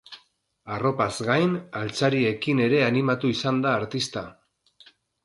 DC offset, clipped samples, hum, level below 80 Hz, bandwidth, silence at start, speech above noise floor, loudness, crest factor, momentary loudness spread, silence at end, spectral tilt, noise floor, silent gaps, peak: under 0.1%; under 0.1%; none; -62 dBFS; 11.5 kHz; 0.1 s; 39 dB; -24 LUFS; 18 dB; 9 LU; 0.95 s; -5.5 dB/octave; -63 dBFS; none; -8 dBFS